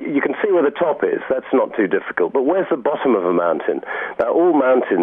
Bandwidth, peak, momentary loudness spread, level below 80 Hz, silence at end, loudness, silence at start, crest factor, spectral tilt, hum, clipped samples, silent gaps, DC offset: 3.8 kHz; -4 dBFS; 6 LU; -64 dBFS; 0 s; -18 LUFS; 0 s; 14 dB; -9 dB/octave; none; under 0.1%; none; under 0.1%